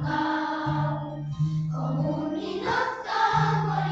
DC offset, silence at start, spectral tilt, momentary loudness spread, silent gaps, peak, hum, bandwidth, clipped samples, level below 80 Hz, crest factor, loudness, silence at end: under 0.1%; 0 s; -7 dB/octave; 6 LU; none; -10 dBFS; none; 7.6 kHz; under 0.1%; -52 dBFS; 16 dB; -27 LUFS; 0 s